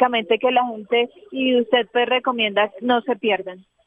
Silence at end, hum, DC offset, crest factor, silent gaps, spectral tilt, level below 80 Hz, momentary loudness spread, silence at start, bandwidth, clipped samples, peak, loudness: 0.25 s; none; under 0.1%; 16 dB; none; -6.5 dB/octave; -72 dBFS; 5 LU; 0 s; 3.8 kHz; under 0.1%; -4 dBFS; -20 LUFS